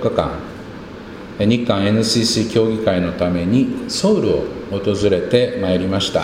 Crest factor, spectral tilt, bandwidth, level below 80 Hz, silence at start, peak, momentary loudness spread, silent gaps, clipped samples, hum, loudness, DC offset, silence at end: 18 dB; -5.5 dB/octave; 16 kHz; -42 dBFS; 0 s; 0 dBFS; 17 LU; none; under 0.1%; none; -17 LUFS; under 0.1%; 0 s